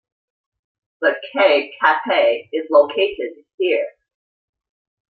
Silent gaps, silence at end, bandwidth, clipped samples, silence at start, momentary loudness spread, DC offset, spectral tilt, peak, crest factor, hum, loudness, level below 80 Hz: 3.54-3.58 s; 1.2 s; 4.8 kHz; under 0.1%; 1 s; 8 LU; under 0.1%; -5 dB/octave; -2 dBFS; 18 dB; none; -18 LUFS; -68 dBFS